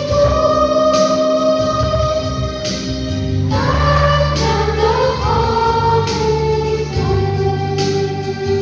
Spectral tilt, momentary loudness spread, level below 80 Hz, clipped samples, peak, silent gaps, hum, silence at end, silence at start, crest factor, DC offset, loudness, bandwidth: -6 dB/octave; 7 LU; -26 dBFS; under 0.1%; -2 dBFS; none; none; 0 s; 0 s; 14 dB; under 0.1%; -15 LUFS; 7.8 kHz